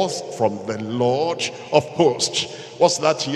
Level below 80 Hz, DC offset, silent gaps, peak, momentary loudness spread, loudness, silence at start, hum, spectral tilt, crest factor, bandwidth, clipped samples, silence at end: -64 dBFS; under 0.1%; none; -2 dBFS; 8 LU; -21 LUFS; 0 s; none; -4 dB/octave; 20 dB; 12.5 kHz; under 0.1%; 0 s